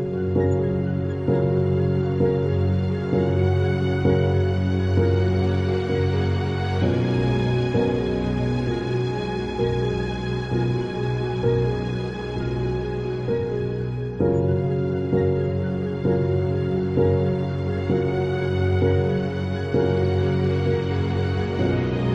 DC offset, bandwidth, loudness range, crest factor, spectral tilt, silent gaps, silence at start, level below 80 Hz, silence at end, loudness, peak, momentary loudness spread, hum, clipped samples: under 0.1%; 7.2 kHz; 3 LU; 14 dB; -8.5 dB/octave; none; 0 s; -42 dBFS; 0 s; -23 LUFS; -6 dBFS; 5 LU; none; under 0.1%